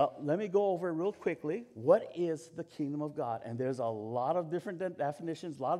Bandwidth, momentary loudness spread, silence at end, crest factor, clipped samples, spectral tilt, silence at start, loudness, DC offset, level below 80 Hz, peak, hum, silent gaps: 12 kHz; 10 LU; 0 s; 22 dB; under 0.1%; -7.5 dB/octave; 0 s; -34 LUFS; under 0.1%; -84 dBFS; -12 dBFS; none; none